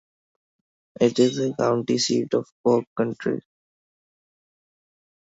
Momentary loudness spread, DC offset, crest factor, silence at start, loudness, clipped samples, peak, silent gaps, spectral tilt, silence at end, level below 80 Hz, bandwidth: 8 LU; under 0.1%; 20 dB; 1 s; -23 LUFS; under 0.1%; -6 dBFS; 2.52-2.64 s, 2.87-2.96 s; -5 dB/octave; 1.85 s; -68 dBFS; 8 kHz